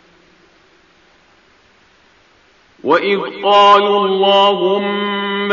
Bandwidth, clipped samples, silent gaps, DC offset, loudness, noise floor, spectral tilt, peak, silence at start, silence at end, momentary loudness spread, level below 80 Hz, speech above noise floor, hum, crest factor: 7.2 kHz; under 0.1%; none; under 0.1%; -13 LUFS; -51 dBFS; -1.5 dB/octave; 0 dBFS; 2.85 s; 0 s; 10 LU; -64 dBFS; 39 dB; none; 16 dB